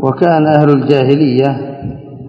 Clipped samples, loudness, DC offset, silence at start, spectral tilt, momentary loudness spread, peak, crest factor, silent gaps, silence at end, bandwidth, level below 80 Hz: 0.5%; -11 LUFS; under 0.1%; 0 s; -9.5 dB/octave; 15 LU; 0 dBFS; 12 dB; none; 0 s; 5.8 kHz; -46 dBFS